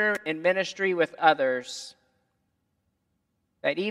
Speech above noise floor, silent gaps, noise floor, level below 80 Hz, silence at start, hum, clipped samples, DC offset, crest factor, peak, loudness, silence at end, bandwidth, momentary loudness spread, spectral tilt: 50 dB; none; -76 dBFS; -82 dBFS; 0 s; none; under 0.1%; under 0.1%; 24 dB; -4 dBFS; -26 LUFS; 0 s; 13 kHz; 15 LU; -4 dB/octave